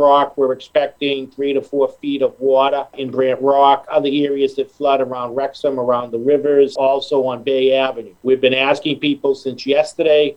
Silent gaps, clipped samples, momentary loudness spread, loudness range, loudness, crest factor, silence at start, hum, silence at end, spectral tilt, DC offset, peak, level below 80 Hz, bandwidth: none; under 0.1%; 7 LU; 1 LU; -17 LUFS; 16 dB; 0 s; none; 0.05 s; -5.5 dB/octave; under 0.1%; 0 dBFS; -62 dBFS; 10.5 kHz